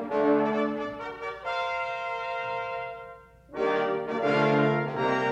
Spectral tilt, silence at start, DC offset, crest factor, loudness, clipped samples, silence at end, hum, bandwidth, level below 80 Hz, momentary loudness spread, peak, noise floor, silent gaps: -7 dB/octave; 0 s; under 0.1%; 16 dB; -28 LUFS; under 0.1%; 0 s; none; 8.2 kHz; -62 dBFS; 12 LU; -12 dBFS; -48 dBFS; none